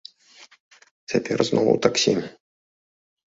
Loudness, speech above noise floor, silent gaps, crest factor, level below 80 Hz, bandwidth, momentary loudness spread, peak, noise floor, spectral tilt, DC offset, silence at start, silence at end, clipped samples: -21 LUFS; 31 dB; 0.60-0.71 s, 0.91-1.07 s; 22 dB; -62 dBFS; 8 kHz; 14 LU; -2 dBFS; -52 dBFS; -4 dB/octave; under 0.1%; 0.4 s; 0.95 s; under 0.1%